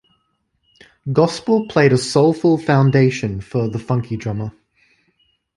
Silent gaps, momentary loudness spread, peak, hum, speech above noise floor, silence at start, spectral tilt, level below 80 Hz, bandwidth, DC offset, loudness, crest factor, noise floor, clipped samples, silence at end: none; 11 LU; -2 dBFS; none; 51 dB; 1.05 s; -6.5 dB/octave; -50 dBFS; 11.5 kHz; under 0.1%; -17 LUFS; 16 dB; -67 dBFS; under 0.1%; 1.05 s